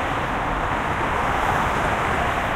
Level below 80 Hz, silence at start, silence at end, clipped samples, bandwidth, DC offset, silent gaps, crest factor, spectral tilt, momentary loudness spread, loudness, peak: -34 dBFS; 0 s; 0 s; under 0.1%; 16 kHz; under 0.1%; none; 14 dB; -5 dB/octave; 3 LU; -22 LUFS; -8 dBFS